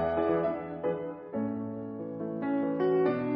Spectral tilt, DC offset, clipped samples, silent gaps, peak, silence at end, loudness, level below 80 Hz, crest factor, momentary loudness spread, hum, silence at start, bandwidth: -7 dB/octave; under 0.1%; under 0.1%; none; -16 dBFS; 0 s; -31 LUFS; -62 dBFS; 14 dB; 10 LU; none; 0 s; 5.2 kHz